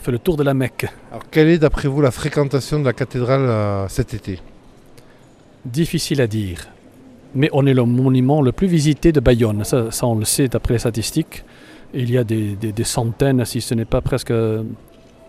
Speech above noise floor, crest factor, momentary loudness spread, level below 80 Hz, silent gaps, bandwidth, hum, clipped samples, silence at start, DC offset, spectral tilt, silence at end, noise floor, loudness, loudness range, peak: 29 dB; 18 dB; 13 LU; -34 dBFS; none; 15.5 kHz; none; under 0.1%; 0 s; under 0.1%; -6 dB/octave; 0.55 s; -47 dBFS; -18 LUFS; 6 LU; 0 dBFS